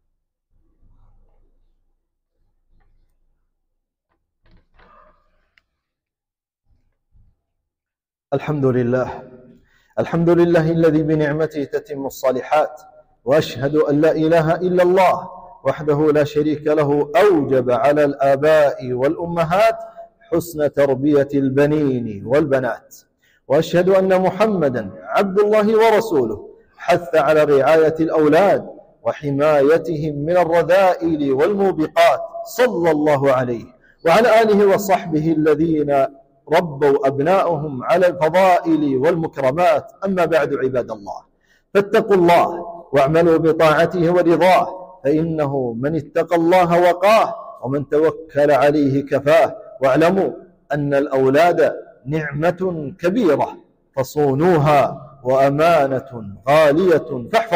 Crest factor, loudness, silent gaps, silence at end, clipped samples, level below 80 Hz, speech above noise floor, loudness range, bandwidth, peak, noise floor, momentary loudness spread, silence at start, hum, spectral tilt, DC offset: 12 dB; -17 LUFS; none; 0 s; under 0.1%; -52 dBFS; 73 dB; 3 LU; 16 kHz; -6 dBFS; -89 dBFS; 11 LU; 8.3 s; none; -7 dB/octave; under 0.1%